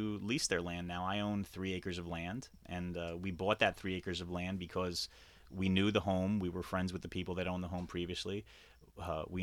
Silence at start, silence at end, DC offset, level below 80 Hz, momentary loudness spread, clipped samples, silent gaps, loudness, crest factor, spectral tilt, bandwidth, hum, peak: 0 s; 0 s; under 0.1%; -58 dBFS; 10 LU; under 0.1%; none; -38 LUFS; 22 dB; -5 dB/octave; 15 kHz; none; -16 dBFS